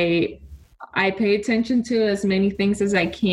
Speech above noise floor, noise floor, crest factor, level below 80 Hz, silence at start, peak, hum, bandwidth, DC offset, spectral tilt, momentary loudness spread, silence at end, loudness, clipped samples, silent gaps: 22 dB; -42 dBFS; 16 dB; -48 dBFS; 0 s; -4 dBFS; none; 11.5 kHz; under 0.1%; -6 dB/octave; 3 LU; 0 s; -21 LUFS; under 0.1%; none